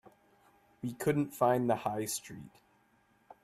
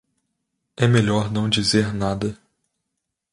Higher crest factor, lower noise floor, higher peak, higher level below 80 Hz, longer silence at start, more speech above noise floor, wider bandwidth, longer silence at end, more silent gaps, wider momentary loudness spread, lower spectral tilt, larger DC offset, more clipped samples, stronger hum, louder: about the same, 20 dB vs 20 dB; second, -69 dBFS vs -80 dBFS; second, -14 dBFS vs -4 dBFS; second, -70 dBFS vs -48 dBFS; about the same, 0.85 s vs 0.8 s; second, 37 dB vs 60 dB; first, 15.5 kHz vs 11.5 kHz; about the same, 0.95 s vs 1 s; neither; first, 15 LU vs 8 LU; about the same, -5.5 dB/octave vs -5.5 dB/octave; neither; neither; neither; second, -33 LUFS vs -20 LUFS